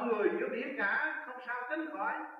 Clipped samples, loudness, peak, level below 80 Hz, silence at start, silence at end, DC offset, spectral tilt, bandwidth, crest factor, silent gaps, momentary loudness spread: under 0.1%; -35 LUFS; -16 dBFS; under -90 dBFS; 0 s; 0 s; under 0.1%; -7 dB/octave; 5.6 kHz; 18 dB; none; 8 LU